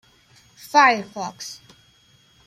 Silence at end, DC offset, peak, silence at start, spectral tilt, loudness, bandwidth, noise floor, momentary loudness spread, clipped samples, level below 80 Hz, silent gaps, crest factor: 0.9 s; under 0.1%; -2 dBFS; 0.75 s; -2.5 dB/octave; -19 LUFS; 15 kHz; -57 dBFS; 20 LU; under 0.1%; -68 dBFS; none; 22 dB